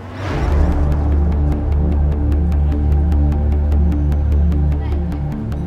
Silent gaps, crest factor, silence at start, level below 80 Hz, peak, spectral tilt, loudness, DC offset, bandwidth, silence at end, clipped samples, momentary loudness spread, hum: none; 12 dB; 0 s; -18 dBFS; -4 dBFS; -9.5 dB/octave; -17 LUFS; under 0.1%; 4.6 kHz; 0 s; under 0.1%; 5 LU; none